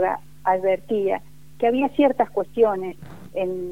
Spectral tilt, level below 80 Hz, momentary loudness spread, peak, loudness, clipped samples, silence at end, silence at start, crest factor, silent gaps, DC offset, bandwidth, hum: -7 dB/octave; -56 dBFS; 10 LU; -6 dBFS; -22 LUFS; under 0.1%; 0 s; 0 s; 16 dB; none; 0.8%; 16 kHz; 50 Hz at -50 dBFS